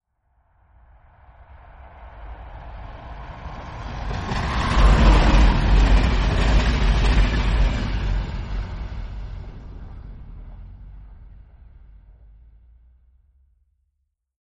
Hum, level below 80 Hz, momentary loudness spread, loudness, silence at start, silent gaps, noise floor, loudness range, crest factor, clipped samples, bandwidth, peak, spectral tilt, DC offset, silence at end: none; -22 dBFS; 25 LU; -21 LUFS; 1.85 s; none; -74 dBFS; 23 LU; 18 dB; under 0.1%; 8.2 kHz; -2 dBFS; -6 dB/octave; under 0.1%; 3.05 s